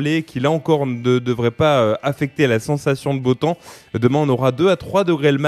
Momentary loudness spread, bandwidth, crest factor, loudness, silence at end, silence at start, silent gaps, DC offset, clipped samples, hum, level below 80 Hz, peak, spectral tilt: 5 LU; 13.5 kHz; 16 dB; -18 LUFS; 0 s; 0 s; none; under 0.1%; under 0.1%; none; -52 dBFS; -2 dBFS; -7 dB/octave